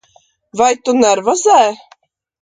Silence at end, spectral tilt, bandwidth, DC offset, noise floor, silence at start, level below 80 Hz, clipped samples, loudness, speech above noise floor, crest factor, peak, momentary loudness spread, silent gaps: 0.65 s; -2.5 dB/octave; 9.6 kHz; under 0.1%; -53 dBFS; 0.55 s; -58 dBFS; under 0.1%; -13 LUFS; 41 dB; 14 dB; 0 dBFS; 12 LU; none